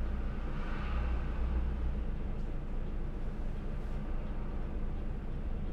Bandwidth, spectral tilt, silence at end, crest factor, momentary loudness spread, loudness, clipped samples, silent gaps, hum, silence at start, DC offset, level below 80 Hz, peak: 5 kHz; -8.5 dB/octave; 0 s; 12 dB; 5 LU; -40 LUFS; under 0.1%; none; none; 0 s; under 0.1%; -34 dBFS; -22 dBFS